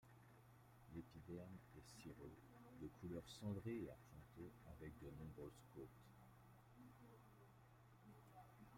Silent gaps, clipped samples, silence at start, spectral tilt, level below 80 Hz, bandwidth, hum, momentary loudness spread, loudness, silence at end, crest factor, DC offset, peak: none; under 0.1%; 0 s; -6.5 dB/octave; -74 dBFS; 16 kHz; none; 17 LU; -59 LUFS; 0 s; 18 dB; under 0.1%; -40 dBFS